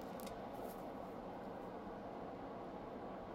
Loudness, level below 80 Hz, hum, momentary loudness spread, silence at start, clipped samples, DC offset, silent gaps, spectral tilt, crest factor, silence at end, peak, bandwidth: -49 LUFS; -66 dBFS; none; 1 LU; 0 s; under 0.1%; under 0.1%; none; -6 dB/octave; 16 dB; 0 s; -32 dBFS; 16 kHz